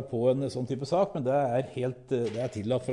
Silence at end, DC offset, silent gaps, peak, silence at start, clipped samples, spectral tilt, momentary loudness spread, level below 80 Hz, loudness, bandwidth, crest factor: 0 s; under 0.1%; none; -14 dBFS; 0 s; under 0.1%; -7.5 dB/octave; 6 LU; -64 dBFS; -29 LUFS; 11 kHz; 14 dB